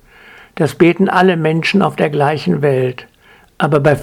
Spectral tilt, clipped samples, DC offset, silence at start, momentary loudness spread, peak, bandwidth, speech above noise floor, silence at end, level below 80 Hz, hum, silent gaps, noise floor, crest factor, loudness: -7 dB/octave; under 0.1%; under 0.1%; 0.55 s; 8 LU; 0 dBFS; 15 kHz; 29 dB; 0 s; -52 dBFS; none; none; -41 dBFS; 14 dB; -14 LUFS